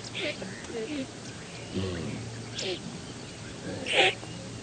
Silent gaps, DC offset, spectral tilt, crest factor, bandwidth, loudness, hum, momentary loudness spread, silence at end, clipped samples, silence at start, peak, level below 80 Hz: none; under 0.1%; -3.5 dB/octave; 24 dB; 9.4 kHz; -32 LUFS; none; 17 LU; 0 s; under 0.1%; 0 s; -8 dBFS; -58 dBFS